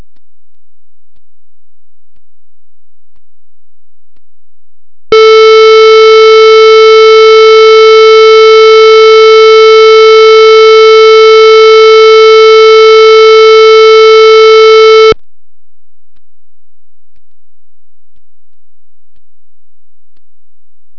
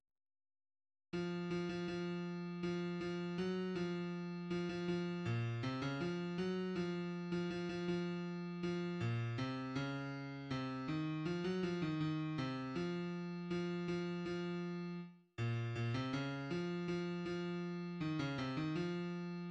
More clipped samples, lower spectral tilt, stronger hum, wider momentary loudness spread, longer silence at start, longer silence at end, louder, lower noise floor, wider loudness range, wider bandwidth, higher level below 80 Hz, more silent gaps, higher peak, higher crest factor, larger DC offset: first, 20% vs under 0.1%; second, -1 dB/octave vs -7 dB/octave; neither; second, 0 LU vs 4 LU; second, 0 s vs 1.15 s; about the same, 0 s vs 0 s; first, -1 LUFS vs -42 LUFS; about the same, under -90 dBFS vs under -90 dBFS; first, 7 LU vs 1 LU; second, 5.4 kHz vs 8.4 kHz; first, -38 dBFS vs -70 dBFS; neither; first, 0 dBFS vs -28 dBFS; second, 4 dB vs 14 dB; first, 0.4% vs under 0.1%